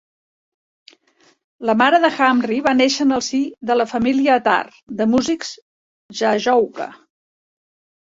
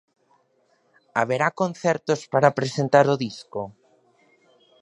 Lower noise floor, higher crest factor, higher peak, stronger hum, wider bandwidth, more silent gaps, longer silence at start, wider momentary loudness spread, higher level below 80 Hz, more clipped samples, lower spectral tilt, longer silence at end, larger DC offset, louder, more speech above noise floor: second, -58 dBFS vs -65 dBFS; second, 18 dB vs 24 dB; about the same, -2 dBFS vs -2 dBFS; neither; second, 7.8 kHz vs 11 kHz; first, 4.83-4.87 s, 5.62-6.09 s vs none; first, 1.6 s vs 1.15 s; second, 11 LU vs 15 LU; first, -58 dBFS vs -68 dBFS; neither; second, -3.5 dB/octave vs -5.5 dB/octave; about the same, 1.05 s vs 1.1 s; neither; first, -17 LUFS vs -22 LUFS; about the same, 41 dB vs 43 dB